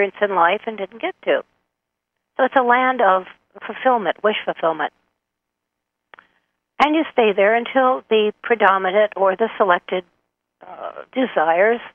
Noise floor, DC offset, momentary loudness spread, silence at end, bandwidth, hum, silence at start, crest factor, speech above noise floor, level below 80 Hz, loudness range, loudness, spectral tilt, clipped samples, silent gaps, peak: -80 dBFS; under 0.1%; 12 LU; 0.05 s; 7 kHz; none; 0 s; 18 dB; 62 dB; -66 dBFS; 6 LU; -18 LUFS; -6 dB/octave; under 0.1%; none; -2 dBFS